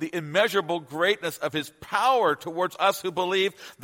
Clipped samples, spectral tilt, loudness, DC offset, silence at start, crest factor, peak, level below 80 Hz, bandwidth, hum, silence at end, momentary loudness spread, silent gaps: under 0.1%; -3.5 dB/octave; -25 LUFS; under 0.1%; 0 s; 18 dB; -6 dBFS; -70 dBFS; 16.5 kHz; none; 0 s; 7 LU; none